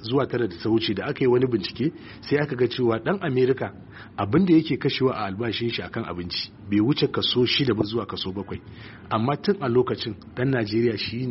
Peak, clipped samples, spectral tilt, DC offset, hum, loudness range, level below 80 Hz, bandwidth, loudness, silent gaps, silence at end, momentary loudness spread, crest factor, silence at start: -8 dBFS; under 0.1%; -5 dB/octave; under 0.1%; none; 2 LU; -54 dBFS; 6 kHz; -24 LUFS; none; 0 s; 10 LU; 16 dB; 0 s